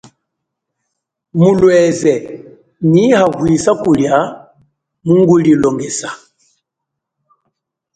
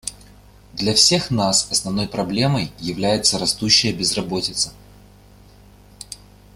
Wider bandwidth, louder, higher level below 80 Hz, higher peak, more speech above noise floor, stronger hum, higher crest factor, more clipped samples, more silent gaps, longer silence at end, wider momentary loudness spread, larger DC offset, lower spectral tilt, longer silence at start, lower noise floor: second, 9.4 kHz vs 16 kHz; first, -12 LUFS vs -18 LUFS; about the same, -48 dBFS vs -46 dBFS; about the same, 0 dBFS vs 0 dBFS; first, 67 dB vs 27 dB; second, none vs 50 Hz at -40 dBFS; second, 14 dB vs 22 dB; neither; neither; first, 1.8 s vs 0.4 s; second, 14 LU vs 18 LU; neither; first, -6.5 dB/octave vs -3 dB/octave; first, 1.35 s vs 0.05 s; first, -78 dBFS vs -47 dBFS